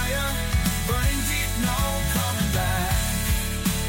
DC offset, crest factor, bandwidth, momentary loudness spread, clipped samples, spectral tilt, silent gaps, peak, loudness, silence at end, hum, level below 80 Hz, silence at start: under 0.1%; 14 dB; 17 kHz; 1 LU; under 0.1%; -4 dB/octave; none; -10 dBFS; -24 LUFS; 0 s; none; -28 dBFS; 0 s